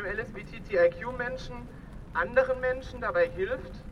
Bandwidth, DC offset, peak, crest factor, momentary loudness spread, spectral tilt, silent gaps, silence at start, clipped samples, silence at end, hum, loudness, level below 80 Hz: 7 kHz; under 0.1%; -10 dBFS; 20 dB; 17 LU; -6.5 dB/octave; none; 0 s; under 0.1%; 0 s; none; -29 LUFS; -46 dBFS